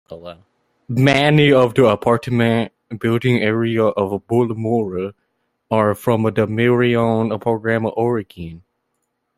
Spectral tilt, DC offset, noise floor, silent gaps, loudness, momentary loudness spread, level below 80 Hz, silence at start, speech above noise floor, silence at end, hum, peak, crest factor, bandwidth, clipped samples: -7 dB/octave; under 0.1%; -72 dBFS; none; -17 LUFS; 13 LU; -52 dBFS; 0.1 s; 55 dB; 0.8 s; none; 0 dBFS; 18 dB; 15 kHz; under 0.1%